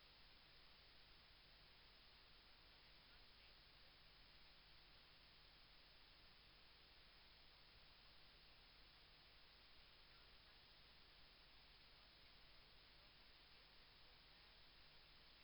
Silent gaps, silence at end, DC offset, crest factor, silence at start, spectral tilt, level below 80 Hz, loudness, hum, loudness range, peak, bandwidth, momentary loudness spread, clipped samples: none; 0 s; under 0.1%; 12 dB; 0 s; -3.5 dB/octave; -76 dBFS; -67 LUFS; 50 Hz at -80 dBFS; 0 LU; -56 dBFS; over 20 kHz; 1 LU; under 0.1%